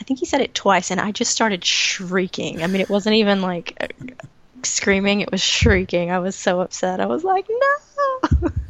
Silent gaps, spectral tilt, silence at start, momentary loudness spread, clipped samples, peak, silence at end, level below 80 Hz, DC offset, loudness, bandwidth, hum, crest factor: none; -3.5 dB/octave; 0 s; 8 LU; under 0.1%; -2 dBFS; 0 s; -34 dBFS; under 0.1%; -19 LUFS; 9.6 kHz; none; 18 dB